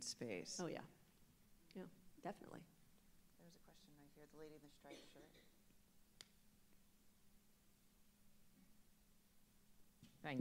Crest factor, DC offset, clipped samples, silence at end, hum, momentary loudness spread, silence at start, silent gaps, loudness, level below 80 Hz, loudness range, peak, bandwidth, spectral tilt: 26 dB; under 0.1%; under 0.1%; 0 s; none; 20 LU; 0 s; none; -54 LUFS; -78 dBFS; 12 LU; -32 dBFS; 16 kHz; -3.5 dB/octave